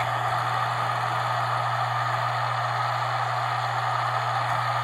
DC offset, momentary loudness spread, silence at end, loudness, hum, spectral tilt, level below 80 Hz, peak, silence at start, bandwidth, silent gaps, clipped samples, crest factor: under 0.1%; 1 LU; 0 s; -25 LUFS; none; -4.5 dB/octave; -66 dBFS; -12 dBFS; 0 s; 15.5 kHz; none; under 0.1%; 14 dB